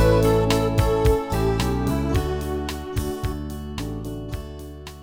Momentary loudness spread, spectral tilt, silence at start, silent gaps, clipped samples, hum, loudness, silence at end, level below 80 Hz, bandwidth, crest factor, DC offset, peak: 14 LU; -6.5 dB/octave; 0 s; none; under 0.1%; none; -23 LUFS; 0 s; -30 dBFS; 17 kHz; 16 dB; under 0.1%; -6 dBFS